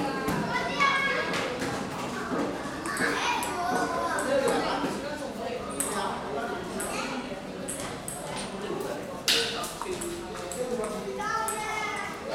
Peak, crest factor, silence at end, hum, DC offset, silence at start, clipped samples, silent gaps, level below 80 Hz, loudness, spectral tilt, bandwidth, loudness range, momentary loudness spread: -8 dBFS; 22 dB; 0 s; none; under 0.1%; 0 s; under 0.1%; none; -54 dBFS; -30 LUFS; -3 dB/octave; 16 kHz; 5 LU; 10 LU